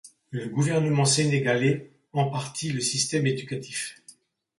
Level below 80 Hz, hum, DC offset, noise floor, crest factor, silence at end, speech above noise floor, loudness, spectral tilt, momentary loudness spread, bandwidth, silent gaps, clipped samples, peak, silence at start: -66 dBFS; none; under 0.1%; -55 dBFS; 16 dB; 0.5 s; 30 dB; -25 LUFS; -4.5 dB/octave; 12 LU; 11.5 kHz; none; under 0.1%; -10 dBFS; 0.05 s